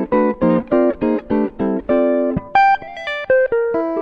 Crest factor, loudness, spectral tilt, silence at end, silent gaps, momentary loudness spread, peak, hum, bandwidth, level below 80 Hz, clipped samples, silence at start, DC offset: 14 dB; -17 LUFS; -8 dB/octave; 0 s; none; 6 LU; -2 dBFS; none; 6.6 kHz; -44 dBFS; under 0.1%; 0 s; under 0.1%